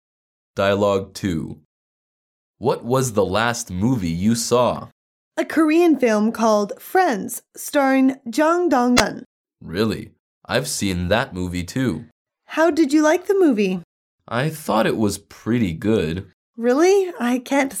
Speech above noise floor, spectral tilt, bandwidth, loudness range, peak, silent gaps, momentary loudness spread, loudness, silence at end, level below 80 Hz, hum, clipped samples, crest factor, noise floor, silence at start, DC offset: over 71 dB; -5 dB/octave; 17.5 kHz; 4 LU; 0 dBFS; 1.65-2.54 s, 4.92-5.31 s, 9.26-9.45 s, 10.19-10.41 s, 12.12-12.25 s, 13.84-14.18 s, 16.33-16.54 s; 11 LU; -20 LUFS; 0 s; -50 dBFS; none; under 0.1%; 20 dB; under -90 dBFS; 0.55 s; under 0.1%